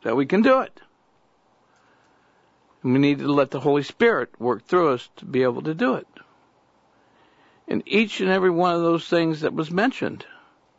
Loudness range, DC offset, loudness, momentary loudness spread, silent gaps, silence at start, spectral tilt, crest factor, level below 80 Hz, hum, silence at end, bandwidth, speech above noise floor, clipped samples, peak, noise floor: 4 LU; under 0.1%; -22 LUFS; 10 LU; none; 0.05 s; -7 dB/octave; 16 dB; -68 dBFS; none; 0.55 s; 8 kHz; 42 dB; under 0.1%; -6 dBFS; -63 dBFS